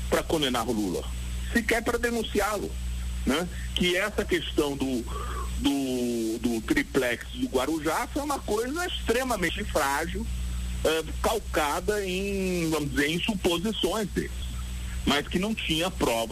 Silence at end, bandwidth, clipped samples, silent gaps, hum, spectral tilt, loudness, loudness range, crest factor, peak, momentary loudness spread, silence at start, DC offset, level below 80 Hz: 0 s; 15.5 kHz; under 0.1%; none; 60 Hz at -40 dBFS; -4 dB/octave; -28 LUFS; 1 LU; 16 dB; -12 dBFS; 8 LU; 0 s; under 0.1%; -36 dBFS